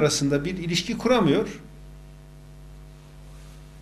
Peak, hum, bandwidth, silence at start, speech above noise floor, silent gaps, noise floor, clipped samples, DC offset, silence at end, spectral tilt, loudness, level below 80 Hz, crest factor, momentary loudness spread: -8 dBFS; none; 13.5 kHz; 0 s; 22 dB; none; -45 dBFS; under 0.1%; under 0.1%; 0 s; -4.5 dB/octave; -23 LUFS; -46 dBFS; 18 dB; 26 LU